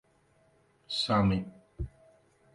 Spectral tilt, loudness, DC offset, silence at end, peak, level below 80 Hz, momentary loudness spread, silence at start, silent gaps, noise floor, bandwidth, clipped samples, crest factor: -6 dB/octave; -31 LUFS; under 0.1%; 0.65 s; -14 dBFS; -50 dBFS; 17 LU; 0.9 s; none; -67 dBFS; 11.5 kHz; under 0.1%; 20 dB